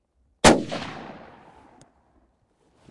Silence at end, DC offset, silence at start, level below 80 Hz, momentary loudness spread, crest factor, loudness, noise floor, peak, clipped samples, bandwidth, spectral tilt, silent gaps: 1.85 s; under 0.1%; 0.45 s; -44 dBFS; 23 LU; 24 dB; -20 LUFS; -66 dBFS; -2 dBFS; under 0.1%; 11.5 kHz; -3.5 dB/octave; none